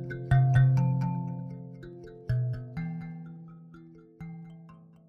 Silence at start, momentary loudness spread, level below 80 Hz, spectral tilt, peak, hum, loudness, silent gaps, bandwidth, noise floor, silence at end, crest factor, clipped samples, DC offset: 0 s; 24 LU; -50 dBFS; -9.5 dB/octave; -12 dBFS; none; -28 LUFS; none; 3.7 kHz; -52 dBFS; 0.35 s; 18 dB; under 0.1%; under 0.1%